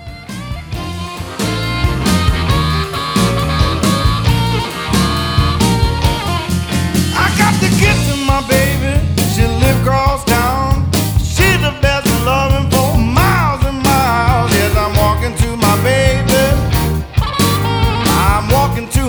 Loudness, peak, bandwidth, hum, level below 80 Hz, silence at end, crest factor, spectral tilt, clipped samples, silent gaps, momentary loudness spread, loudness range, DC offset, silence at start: -13 LUFS; 0 dBFS; over 20 kHz; none; -20 dBFS; 0 s; 12 dB; -5 dB/octave; under 0.1%; none; 5 LU; 2 LU; under 0.1%; 0 s